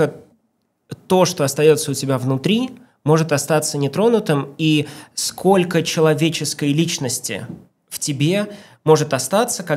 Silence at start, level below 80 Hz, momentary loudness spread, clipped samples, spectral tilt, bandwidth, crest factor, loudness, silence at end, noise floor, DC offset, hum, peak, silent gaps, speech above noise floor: 0 s; -64 dBFS; 11 LU; under 0.1%; -5 dB/octave; 16 kHz; 18 dB; -18 LUFS; 0 s; -68 dBFS; under 0.1%; none; 0 dBFS; none; 50 dB